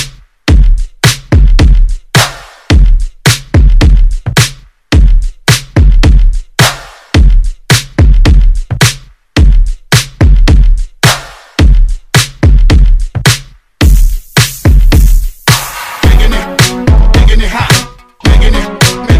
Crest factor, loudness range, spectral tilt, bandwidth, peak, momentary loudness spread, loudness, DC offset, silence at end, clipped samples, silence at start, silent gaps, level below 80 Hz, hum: 6 dB; 1 LU; -4.5 dB/octave; 15.5 kHz; 0 dBFS; 6 LU; -9 LUFS; under 0.1%; 0 s; 5%; 0 s; none; -8 dBFS; none